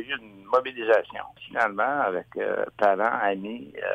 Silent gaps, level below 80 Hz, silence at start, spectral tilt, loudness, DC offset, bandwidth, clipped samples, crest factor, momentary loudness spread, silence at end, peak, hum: none; -68 dBFS; 0 s; -5.5 dB/octave; -26 LUFS; under 0.1%; 8.8 kHz; under 0.1%; 18 dB; 10 LU; 0 s; -8 dBFS; none